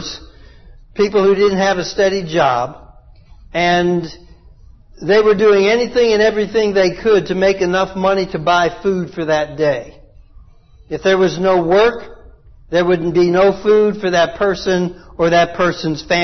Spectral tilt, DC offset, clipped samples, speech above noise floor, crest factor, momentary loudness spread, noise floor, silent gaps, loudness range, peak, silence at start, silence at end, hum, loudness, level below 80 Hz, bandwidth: -5.5 dB/octave; under 0.1%; under 0.1%; 30 dB; 12 dB; 8 LU; -44 dBFS; none; 4 LU; -2 dBFS; 0 s; 0 s; none; -15 LUFS; -42 dBFS; 6.4 kHz